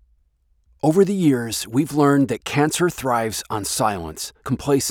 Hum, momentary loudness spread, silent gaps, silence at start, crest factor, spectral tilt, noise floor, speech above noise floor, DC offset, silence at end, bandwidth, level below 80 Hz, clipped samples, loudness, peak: none; 9 LU; none; 0.85 s; 16 dB; -5 dB/octave; -62 dBFS; 42 dB; under 0.1%; 0 s; 18.5 kHz; -50 dBFS; under 0.1%; -20 LUFS; -4 dBFS